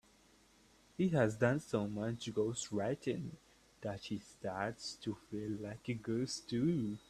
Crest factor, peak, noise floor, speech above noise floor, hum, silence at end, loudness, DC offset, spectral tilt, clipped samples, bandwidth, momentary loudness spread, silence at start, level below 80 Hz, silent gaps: 22 dB; -18 dBFS; -67 dBFS; 29 dB; none; 0.1 s; -39 LUFS; under 0.1%; -6 dB/octave; under 0.1%; 13.5 kHz; 12 LU; 1 s; -68 dBFS; none